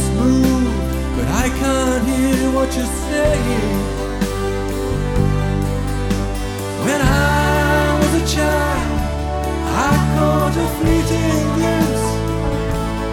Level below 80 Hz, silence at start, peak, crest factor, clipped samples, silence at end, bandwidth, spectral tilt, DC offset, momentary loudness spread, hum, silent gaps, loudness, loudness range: -24 dBFS; 0 s; -2 dBFS; 14 dB; under 0.1%; 0 s; 18 kHz; -5.5 dB/octave; under 0.1%; 6 LU; none; none; -18 LUFS; 3 LU